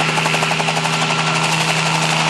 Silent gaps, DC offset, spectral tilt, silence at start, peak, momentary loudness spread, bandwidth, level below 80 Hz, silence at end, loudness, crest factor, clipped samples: none; under 0.1%; -3 dB/octave; 0 s; -2 dBFS; 1 LU; 13.5 kHz; -54 dBFS; 0 s; -16 LUFS; 14 dB; under 0.1%